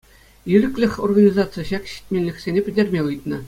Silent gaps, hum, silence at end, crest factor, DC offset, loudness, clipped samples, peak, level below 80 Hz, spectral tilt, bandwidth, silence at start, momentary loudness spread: none; none; 0 s; 18 dB; under 0.1%; -20 LUFS; under 0.1%; -2 dBFS; -46 dBFS; -7.5 dB/octave; 15 kHz; 0.45 s; 11 LU